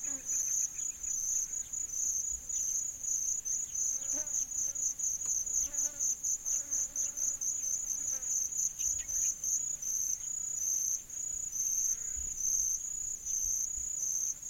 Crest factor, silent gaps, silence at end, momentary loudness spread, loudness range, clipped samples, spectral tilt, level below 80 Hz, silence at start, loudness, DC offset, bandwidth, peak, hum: 16 dB; none; 0 s; 4 LU; 1 LU; under 0.1%; 0.5 dB/octave; -60 dBFS; 0 s; -32 LUFS; under 0.1%; 16.5 kHz; -20 dBFS; none